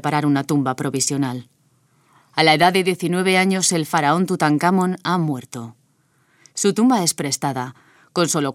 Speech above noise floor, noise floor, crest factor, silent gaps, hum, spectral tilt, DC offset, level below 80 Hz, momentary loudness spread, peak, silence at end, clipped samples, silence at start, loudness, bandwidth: 43 dB; -61 dBFS; 20 dB; none; none; -4 dB/octave; under 0.1%; -66 dBFS; 13 LU; 0 dBFS; 0 s; under 0.1%; 0.05 s; -19 LUFS; 16.5 kHz